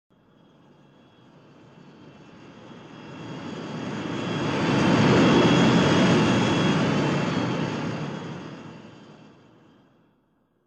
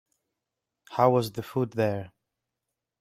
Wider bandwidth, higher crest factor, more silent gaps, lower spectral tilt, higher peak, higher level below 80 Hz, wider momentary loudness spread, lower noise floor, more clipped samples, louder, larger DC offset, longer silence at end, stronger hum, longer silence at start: second, 9.4 kHz vs 16 kHz; second, 18 dB vs 24 dB; neither; about the same, -6 dB/octave vs -7 dB/octave; about the same, -6 dBFS vs -6 dBFS; first, -54 dBFS vs -66 dBFS; first, 24 LU vs 13 LU; second, -67 dBFS vs -86 dBFS; neither; first, -22 LUFS vs -27 LUFS; neither; first, 1.55 s vs 0.95 s; neither; first, 2.05 s vs 0.9 s